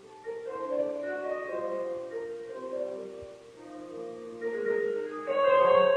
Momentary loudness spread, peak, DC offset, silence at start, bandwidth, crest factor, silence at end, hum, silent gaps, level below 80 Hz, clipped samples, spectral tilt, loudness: 19 LU; -12 dBFS; under 0.1%; 0 s; 9.6 kHz; 18 dB; 0 s; none; none; -70 dBFS; under 0.1%; -5.5 dB/octave; -31 LUFS